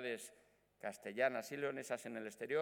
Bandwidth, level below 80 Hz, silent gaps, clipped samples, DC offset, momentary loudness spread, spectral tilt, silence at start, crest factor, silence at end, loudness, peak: 19 kHz; -88 dBFS; none; under 0.1%; under 0.1%; 11 LU; -4 dB/octave; 0 s; 20 dB; 0 s; -43 LUFS; -22 dBFS